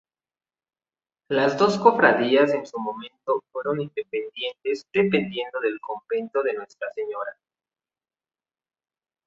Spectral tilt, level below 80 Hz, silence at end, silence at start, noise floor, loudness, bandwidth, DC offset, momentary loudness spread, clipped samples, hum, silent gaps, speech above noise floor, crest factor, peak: -5.5 dB/octave; -70 dBFS; 1.95 s; 1.3 s; under -90 dBFS; -24 LUFS; 7.8 kHz; under 0.1%; 14 LU; under 0.1%; none; none; over 67 dB; 24 dB; -2 dBFS